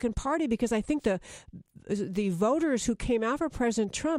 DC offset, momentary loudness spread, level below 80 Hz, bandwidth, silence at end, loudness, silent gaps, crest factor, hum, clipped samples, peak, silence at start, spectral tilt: under 0.1%; 8 LU; -46 dBFS; 14 kHz; 0 s; -29 LUFS; none; 16 dB; none; under 0.1%; -12 dBFS; 0 s; -5 dB/octave